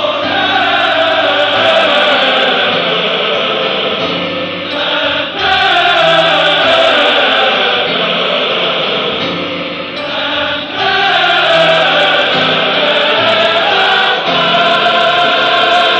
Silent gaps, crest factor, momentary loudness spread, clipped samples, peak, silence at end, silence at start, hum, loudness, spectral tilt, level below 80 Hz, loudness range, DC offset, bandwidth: none; 12 dB; 7 LU; under 0.1%; 0 dBFS; 0 s; 0 s; none; -10 LUFS; -3.5 dB/octave; -50 dBFS; 4 LU; under 0.1%; 9 kHz